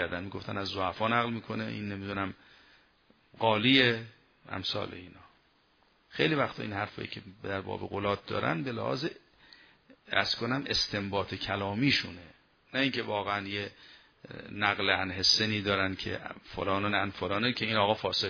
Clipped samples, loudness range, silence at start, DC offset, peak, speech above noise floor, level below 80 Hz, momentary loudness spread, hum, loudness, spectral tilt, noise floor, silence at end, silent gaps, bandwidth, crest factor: under 0.1%; 6 LU; 0 s; under 0.1%; -8 dBFS; 36 dB; -62 dBFS; 14 LU; none; -30 LUFS; -4.5 dB/octave; -67 dBFS; 0 s; none; 5.4 kHz; 24 dB